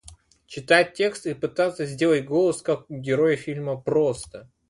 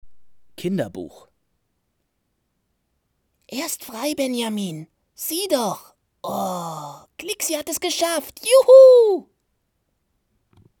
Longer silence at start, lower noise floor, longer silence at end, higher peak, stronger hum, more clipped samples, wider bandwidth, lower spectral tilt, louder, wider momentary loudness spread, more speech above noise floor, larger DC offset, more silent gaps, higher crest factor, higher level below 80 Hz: about the same, 0.05 s vs 0.05 s; second, -50 dBFS vs -73 dBFS; second, 0.25 s vs 1.6 s; about the same, -4 dBFS vs -2 dBFS; neither; neither; second, 11.5 kHz vs 19.5 kHz; first, -5 dB/octave vs -3.5 dB/octave; second, -23 LUFS vs -18 LUFS; second, 10 LU vs 24 LU; second, 27 dB vs 55 dB; neither; neither; about the same, 20 dB vs 20 dB; first, -58 dBFS vs -66 dBFS